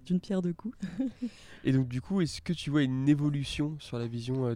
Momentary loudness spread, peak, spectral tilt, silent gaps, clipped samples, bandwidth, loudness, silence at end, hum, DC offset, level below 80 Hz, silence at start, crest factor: 10 LU; -14 dBFS; -7 dB/octave; none; under 0.1%; 11.5 kHz; -31 LUFS; 0 s; none; under 0.1%; -56 dBFS; 0.05 s; 16 dB